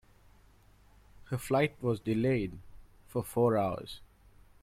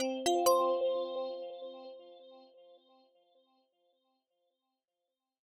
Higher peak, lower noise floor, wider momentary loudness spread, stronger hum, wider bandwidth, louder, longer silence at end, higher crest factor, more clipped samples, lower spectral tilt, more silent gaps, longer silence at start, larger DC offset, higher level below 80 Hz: about the same, -16 dBFS vs -16 dBFS; second, -61 dBFS vs -89 dBFS; second, 15 LU vs 22 LU; neither; first, 16 kHz vs 11.5 kHz; about the same, -32 LUFS vs -32 LUFS; second, 0.55 s vs 3 s; about the same, 18 dB vs 22 dB; neither; first, -7 dB/octave vs -2 dB/octave; neither; first, 1.15 s vs 0 s; neither; first, -58 dBFS vs -82 dBFS